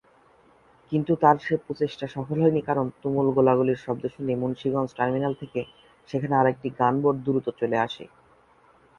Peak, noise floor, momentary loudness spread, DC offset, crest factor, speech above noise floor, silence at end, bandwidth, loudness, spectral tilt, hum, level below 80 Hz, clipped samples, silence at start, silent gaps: -4 dBFS; -58 dBFS; 11 LU; under 0.1%; 22 dB; 34 dB; 0.95 s; 7 kHz; -25 LUFS; -8.5 dB/octave; none; -60 dBFS; under 0.1%; 0.9 s; none